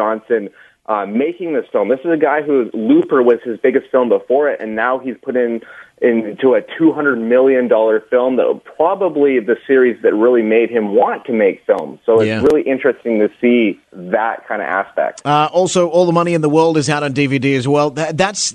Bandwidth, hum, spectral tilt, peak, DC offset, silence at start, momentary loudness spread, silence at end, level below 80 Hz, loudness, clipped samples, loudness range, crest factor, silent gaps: 10 kHz; none; -5.5 dB/octave; 0 dBFS; under 0.1%; 0 s; 6 LU; 0 s; -56 dBFS; -15 LUFS; under 0.1%; 2 LU; 14 dB; none